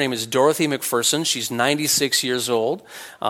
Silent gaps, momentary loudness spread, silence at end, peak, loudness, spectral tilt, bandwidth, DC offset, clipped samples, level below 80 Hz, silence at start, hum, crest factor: none; 5 LU; 0 s; -2 dBFS; -20 LUFS; -2.5 dB/octave; 16.5 kHz; under 0.1%; under 0.1%; -66 dBFS; 0 s; none; 18 dB